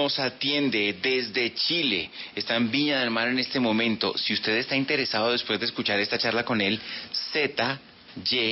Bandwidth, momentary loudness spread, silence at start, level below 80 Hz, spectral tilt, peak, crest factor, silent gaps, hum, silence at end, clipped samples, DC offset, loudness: 6 kHz; 6 LU; 0 s; -64 dBFS; -7 dB/octave; -10 dBFS; 16 dB; none; none; 0 s; under 0.1%; under 0.1%; -25 LUFS